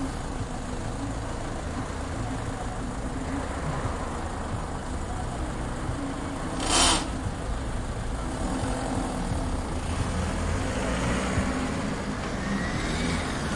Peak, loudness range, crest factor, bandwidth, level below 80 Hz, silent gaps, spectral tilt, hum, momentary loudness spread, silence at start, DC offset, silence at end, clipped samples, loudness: -10 dBFS; 5 LU; 20 dB; 11.5 kHz; -36 dBFS; none; -4 dB/octave; none; 7 LU; 0 s; under 0.1%; 0 s; under 0.1%; -30 LUFS